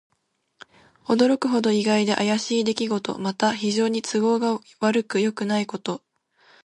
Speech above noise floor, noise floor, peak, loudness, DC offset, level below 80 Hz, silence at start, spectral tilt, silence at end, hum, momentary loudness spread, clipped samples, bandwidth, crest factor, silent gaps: 50 dB; -72 dBFS; -6 dBFS; -23 LUFS; under 0.1%; -70 dBFS; 1.1 s; -4.5 dB/octave; 0.7 s; none; 8 LU; under 0.1%; 11 kHz; 18 dB; none